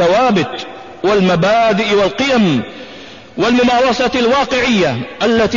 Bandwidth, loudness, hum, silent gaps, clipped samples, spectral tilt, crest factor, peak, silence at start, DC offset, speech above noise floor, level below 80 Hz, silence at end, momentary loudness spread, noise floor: 7.4 kHz; -13 LUFS; none; none; under 0.1%; -5 dB/octave; 10 dB; -4 dBFS; 0 s; 0.5%; 21 dB; -42 dBFS; 0 s; 17 LU; -34 dBFS